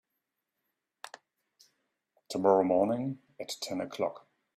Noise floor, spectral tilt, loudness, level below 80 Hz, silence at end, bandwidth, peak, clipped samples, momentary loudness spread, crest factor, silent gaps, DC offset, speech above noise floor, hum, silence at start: -85 dBFS; -5.5 dB/octave; -30 LUFS; -76 dBFS; 0.4 s; 14.5 kHz; -10 dBFS; under 0.1%; 23 LU; 22 dB; none; under 0.1%; 56 dB; none; 1.05 s